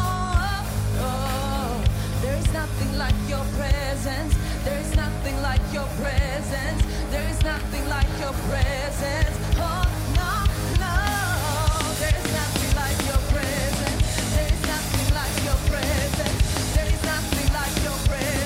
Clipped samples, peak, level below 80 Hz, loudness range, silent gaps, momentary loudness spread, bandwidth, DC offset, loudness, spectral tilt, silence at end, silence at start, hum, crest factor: under 0.1%; -6 dBFS; -26 dBFS; 2 LU; none; 3 LU; 16 kHz; under 0.1%; -24 LUFS; -4.5 dB/octave; 0 s; 0 s; none; 18 dB